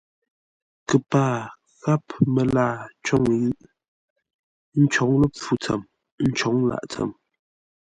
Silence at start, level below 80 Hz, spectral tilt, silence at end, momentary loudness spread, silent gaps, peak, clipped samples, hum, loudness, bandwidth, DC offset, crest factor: 0.9 s; -52 dBFS; -6.5 dB/octave; 0.7 s; 10 LU; 3.88-4.16 s, 4.34-4.72 s, 6.12-6.18 s; -4 dBFS; under 0.1%; none; -23 LUFS; 9.4 kHz; under 0.1%; 20 dB